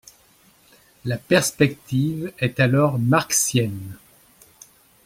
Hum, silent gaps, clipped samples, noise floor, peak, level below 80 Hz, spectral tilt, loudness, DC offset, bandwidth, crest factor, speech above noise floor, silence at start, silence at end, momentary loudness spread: none; none; under 0.1%; -56 dBFS; -2 dBFS; -56 dBFS; -4.5 dB/octave; -20 LUFS; under 0.1%; 16.5 kHz; 20 dB; 35 dB; 1.05 s; 1.1 s; 11 LU